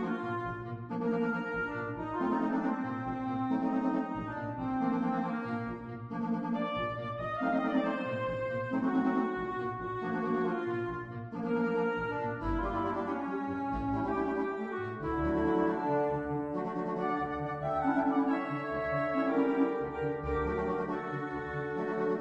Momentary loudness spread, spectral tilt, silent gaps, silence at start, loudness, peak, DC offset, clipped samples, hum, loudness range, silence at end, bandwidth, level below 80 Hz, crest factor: 7 LU; -8.5 dB/octave; none; 0 s; -33 LUFS; -16 dBFS; under 0.1%; under 0.1%; none; 3 LU; 0 s; 7.4 kHz; -52 dBFS; 16 dB